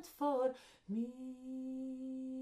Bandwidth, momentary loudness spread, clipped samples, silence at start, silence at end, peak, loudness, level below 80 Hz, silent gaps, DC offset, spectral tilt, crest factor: 15.5 kHz; 11 LU; under 0.1%; 0 s; 0 s; -24 dBFS; -41 LUFS; -78 dBFS; none; under 0.1%; -6.5 dB/octave; 16 dB